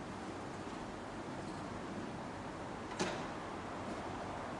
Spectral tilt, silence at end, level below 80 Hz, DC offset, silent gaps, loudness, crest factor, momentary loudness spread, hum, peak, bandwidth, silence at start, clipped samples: -5 dB/octave; 0 s; -62 dBFS; under 0.1%; none; -44 LUFS; 20 dB; 6 LU; none; -24 dBFS; 11.5 kHz; 0 s; under 0.1%